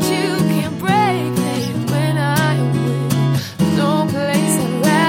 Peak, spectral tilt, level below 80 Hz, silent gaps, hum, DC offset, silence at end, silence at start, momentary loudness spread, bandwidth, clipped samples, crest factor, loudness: -2 dBFS; -5.5 dB/octave; -50 dBFS; none; none; under 0.1%; 0 s; 0 s; 4 LU; 17 kHz; under 0.1%; 14 dB; -17 LUFS